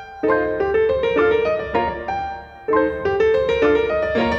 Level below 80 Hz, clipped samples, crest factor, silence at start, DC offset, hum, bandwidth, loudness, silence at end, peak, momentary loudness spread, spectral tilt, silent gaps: -40 dBFS; under 0.1%; 14 dB; 0 s; under 0.1%; none; 6.8 kHz; -19 LUFS; 0 s; -4 dBFS; 8 LU; -6.5 dB/octave; none